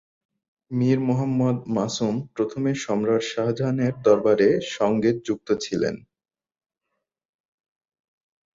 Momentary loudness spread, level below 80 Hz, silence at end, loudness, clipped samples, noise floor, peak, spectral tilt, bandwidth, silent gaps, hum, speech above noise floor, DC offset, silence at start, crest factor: 7 LU; -62 dBFS; 2.55 s; -23 LUFS; under 0.1%; -81 dBFS; -6 dBFS; -6.5 dB/octave; 7.8 kHz; none; none; 59 dB; under 0.1%; 0.7 s; 18 dB